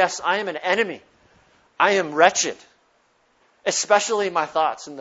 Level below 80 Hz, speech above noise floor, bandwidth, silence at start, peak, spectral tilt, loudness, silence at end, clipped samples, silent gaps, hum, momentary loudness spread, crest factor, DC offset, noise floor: -70 dBFS; 42 dB; 8.2 kHz; 0 s; 0 dBFS; -1.5 dB/octave; -21 LUFS; 0 s; under 0.1%; none; none; 10 LU; 22 dB; under 0.1%; -63 dBFS